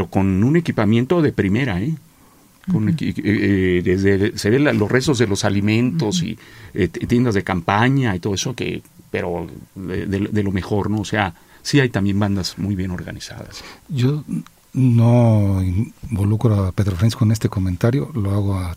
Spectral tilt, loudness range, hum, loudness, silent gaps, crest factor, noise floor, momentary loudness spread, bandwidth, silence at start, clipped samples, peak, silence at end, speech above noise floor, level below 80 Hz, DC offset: -6.5 dB/octave; 4 LU; none; -19 LUFS; none; 18 dB; -50 dBFS; 12 LU; 15.5 kHz; 0 s; under 0.1%; -2 dBFS; 0 s; 32 dB; -44 dBFS; under 0.1%